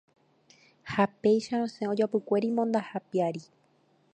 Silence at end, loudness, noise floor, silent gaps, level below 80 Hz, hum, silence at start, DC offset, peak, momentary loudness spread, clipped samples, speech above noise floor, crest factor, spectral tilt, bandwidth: 0.7 s; -29 LUFS; -67 dBFS; none; -72 dBFS; none; 0.85 s; under 0.1%; -10 dBFS; 7 LU; under 0.1%; 39 dB; 20 dB; -6.5 dB/octave; 9.2 kHz